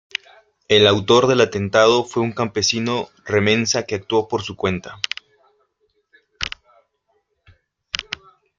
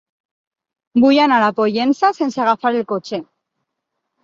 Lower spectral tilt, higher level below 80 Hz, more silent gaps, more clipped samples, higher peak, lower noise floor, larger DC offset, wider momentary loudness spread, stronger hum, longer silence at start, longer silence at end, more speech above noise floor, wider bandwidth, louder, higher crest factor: second, -4 dB/octave vs -5.5 dB/octave; first, -54 dBFS vs -64 dBFS; neither; neither; about the same, 0 dBFS vs -2 dBFS; second, -68 dBFS vs -77 dBFS; neither; first, 15 LU vs 11 LU; neither; second, 0.7 s vs 0.95 s; second, 0.55 s vs 1 s; second, 50 dB vs 61 dB; about the same, 7.6 kHz vs 7.4 kHz; second, -19 LUFS vs -16 LUFS; about the same, 20 dB vs 16 dB